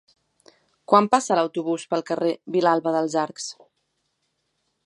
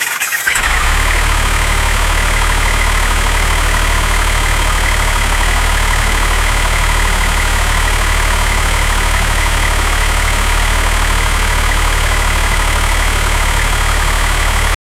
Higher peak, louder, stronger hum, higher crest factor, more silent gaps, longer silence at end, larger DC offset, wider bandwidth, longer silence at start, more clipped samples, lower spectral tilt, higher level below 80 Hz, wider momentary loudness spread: about the same, -2 dBFS vs 0 dBFS; second, -22 LUFS vs -13 LUFS; neither; first, 22 dB vs 12 dB; neither; first, 1.35 s vs 0.25 s; neither; second, 11.5 kHz vs 16 kHz; first, 0.9 s vs 0 s; neither; first, -4.5 dB/octave vs -2.5 dB/octave; second, -80 dBFS vs -14 dBFS; first, 9 LU vs 1 LU